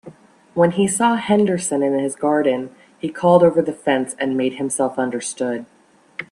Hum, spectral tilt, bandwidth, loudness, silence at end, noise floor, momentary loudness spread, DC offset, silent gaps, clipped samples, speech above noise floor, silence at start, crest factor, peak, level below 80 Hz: none; -5 dB/octave; 12.5 kHz; -19 LUFS; 0.05 s; -43 dBFS; 14 LU; under 0.1%; none; under 0.1%; 25 dB; 0.05 s; 18 dB; 0 dBFS; -62 dBFS